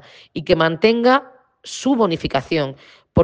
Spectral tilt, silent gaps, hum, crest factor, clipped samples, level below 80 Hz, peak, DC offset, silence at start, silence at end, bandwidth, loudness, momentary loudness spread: -5.5 dB/octave; none; none; 18 dB; under 0.1%; -48 dBFS; 0 dBFS; under 0.1%; 0.35 s; 0 s; 9.8 kHz; -18 LUFS; 14 LU